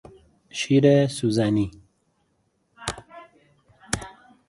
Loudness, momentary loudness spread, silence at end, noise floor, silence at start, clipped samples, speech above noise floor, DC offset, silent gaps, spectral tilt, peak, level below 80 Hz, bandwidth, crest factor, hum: -23 LUFS; 18 LU; 0.4 s; -69 dBFS; 0.55 s; under 0.1%; 49 dB; under 0.1%; none; -6 dB/octave; -6 dBFS; -52 dBFS; 11.5 kHz; 20 dB; none